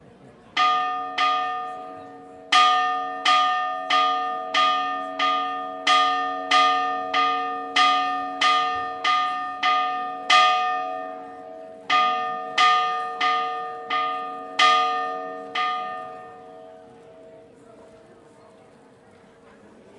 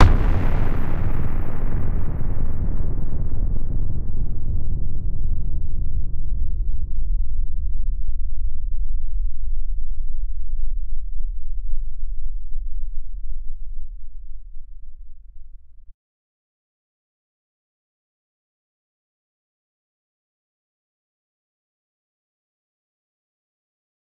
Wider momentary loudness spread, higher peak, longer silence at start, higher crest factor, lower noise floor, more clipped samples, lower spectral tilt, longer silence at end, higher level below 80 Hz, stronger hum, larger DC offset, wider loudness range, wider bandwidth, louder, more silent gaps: about the same, 15 LU vs 14 LU; second, -4 dBFS vs 0 dBFS; first, 0.25 s vs 0 s; about the same, 20 dB vs 18 dB; first, -52 dBFS vs -37 dBFS; neither; second, -0.5 dB/octave vs -8.5 dB/octave; second, 2 s vs 8.3 s; second, -72 dBFS vs -22 dBFS; neither; neither; second, 4 LU vs 14 LU; first, 11 kHz vs 2.5 kHz; first, -22 LUFS vs -29 LUFS; neither